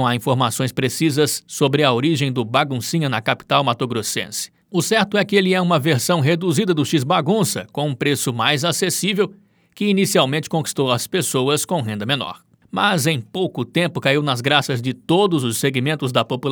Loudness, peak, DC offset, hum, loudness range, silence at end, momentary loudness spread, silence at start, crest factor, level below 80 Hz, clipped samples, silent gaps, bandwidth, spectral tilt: -19 LUFS; 0 dBFS; under 0.1%; none; 2 LU; 0 s; 6 LU; 0 s; 18 dB; -64 dBFS; under 0.1%; none; over 20 kHz; -4.5 dB/octave